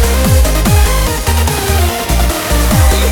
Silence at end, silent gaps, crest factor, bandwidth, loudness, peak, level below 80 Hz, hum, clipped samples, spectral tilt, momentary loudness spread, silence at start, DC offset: 0 s; none; 10 dB; over 20 kHz; -12 LUFS; 0 dBFS; -12 dBFS; none; under 0.1%; -4.5 dB/octave; 3 LU; 0 s; under 0.1%